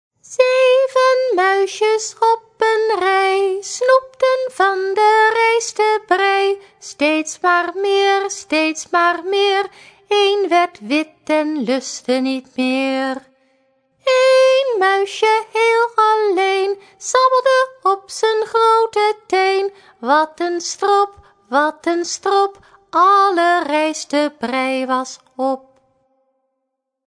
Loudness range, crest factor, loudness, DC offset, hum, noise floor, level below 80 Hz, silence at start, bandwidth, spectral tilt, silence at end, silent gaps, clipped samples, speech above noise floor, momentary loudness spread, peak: 3 LU; 16 dB; -16 LUFS; under 0.1%; none; -76 dBFS; -68 dBFS; 0.3 s; 10.5 kHz; -1.5 dB/octave; 1.5 s; none; under 0.1%; 59 dB; 8 LU; 0 dBFS